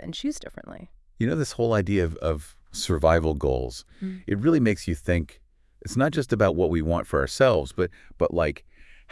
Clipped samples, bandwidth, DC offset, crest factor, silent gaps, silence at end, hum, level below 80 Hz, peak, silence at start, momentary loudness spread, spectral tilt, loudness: under 0.1%; 12 kHz; under 0.1%; 18 dB; none; 0.3 s; none; -40 dBFS; -6 dBFS; 0 s; 16 LU; -6 dB/octave; -25 LUFS